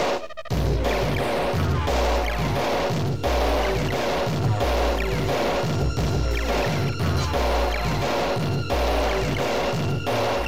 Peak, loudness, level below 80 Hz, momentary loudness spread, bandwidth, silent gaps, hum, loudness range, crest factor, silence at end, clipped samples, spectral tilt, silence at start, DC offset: -10 dBFS; -24 LUFS; -30 dBFS; 2 LU; 16.5 kHz; none; none; 0 LU; 12 dB; 0 s; under 0.1%; -5.5 dB/octave; 0 s; 2%